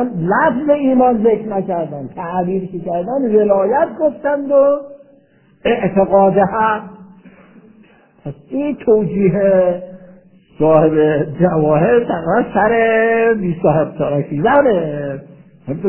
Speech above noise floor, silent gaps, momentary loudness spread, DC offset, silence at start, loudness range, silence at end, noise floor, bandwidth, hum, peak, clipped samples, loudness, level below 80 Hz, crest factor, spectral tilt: 36 dB; none; 11 LU; 0.3%; 0 s; 4 LU; 0 s; -50 dBFS; 3.2 kHz; none; 0 dBFS; under 0.1%; -15 LUFS; -48 dBFS; 16 dB; -11.5 dB/octave